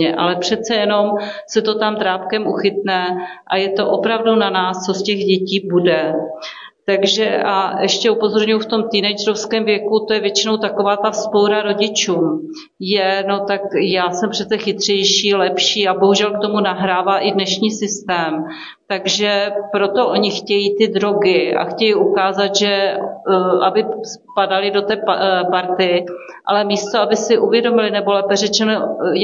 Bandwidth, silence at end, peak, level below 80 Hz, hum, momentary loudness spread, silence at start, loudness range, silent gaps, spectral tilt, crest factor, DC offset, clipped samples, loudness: 7.6 kHz; 0 s; -2 dBFS; -64 dBFS; none; 6 LU; 0 s; 2 LU; none; -3.5 dB/octave; 14 dB; under 0.1%; under 0.1%; -16 LUFS